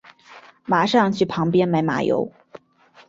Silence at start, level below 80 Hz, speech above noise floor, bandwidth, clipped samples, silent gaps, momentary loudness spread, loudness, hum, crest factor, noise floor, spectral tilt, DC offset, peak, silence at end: 0.3 s; -60 dBFS; 34 dB; 7.8 kHz; under 0.1%; none; 7 LU; -20 LUFS; none; 18 dB; -53 dBFS; -6.5 dB/octave; under 0.1%; -4 dBFS; 0.5 s